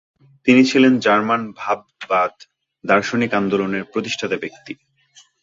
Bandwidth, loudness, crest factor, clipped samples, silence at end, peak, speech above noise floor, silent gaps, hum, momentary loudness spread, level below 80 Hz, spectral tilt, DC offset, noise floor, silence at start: 7.6 kHz; -18 LUFS; 18 dB; under 0.1%; 0.7 s; -2 dBFS; 35 dB; none; none; 15 LU; -60 dBFS; -5 dB/octave; under 0.1%; -53 dBFS; 0.45 s